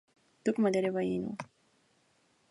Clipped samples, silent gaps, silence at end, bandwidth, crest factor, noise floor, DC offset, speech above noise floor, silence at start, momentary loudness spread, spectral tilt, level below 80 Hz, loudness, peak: under 0.1%; none; 1.05 s; 11.5 kHz; 18 dB; -71 dBFS; under 0.1%; 40 dB; 0.45 s; 15 LU; -6.5 dB/octave; -72 dBFS; -32 LUFS; -18 dBFS